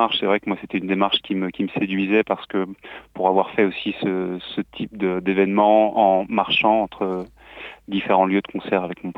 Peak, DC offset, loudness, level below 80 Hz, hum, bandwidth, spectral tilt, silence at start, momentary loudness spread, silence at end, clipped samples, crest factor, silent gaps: -2 dBFS; under 0.1%; -21 LUFS; -58 dBFS; none; 5.8 kHz; -8 dB/octave; 0 s; 13 LU; 0.05 s; under 0.1%; 18 dB; none